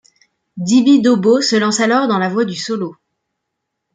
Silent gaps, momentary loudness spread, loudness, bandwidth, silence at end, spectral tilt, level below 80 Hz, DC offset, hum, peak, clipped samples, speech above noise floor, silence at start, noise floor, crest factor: none; 11 LU; -14 LUFS; 9.6 kHz; 1 s; -4.5 dB/octave; -64 dBFS; under 0.1%; none; -2 dBFS; under 0.1%; 62 dB; 0.55 s; -76 dBFS; 14 dB